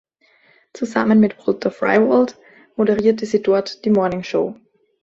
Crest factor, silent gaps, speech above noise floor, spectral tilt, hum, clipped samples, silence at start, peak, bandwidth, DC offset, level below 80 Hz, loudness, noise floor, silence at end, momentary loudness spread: 16 dB; none; 39 dB; -7 dB/octave; none; under 0.1%; 0.75 s; -2 dBFS; 7.6 kHz; under 0.1%; -58 dBFS; -18 LUFS; -56 dBFS; 0.5 s; 8 LU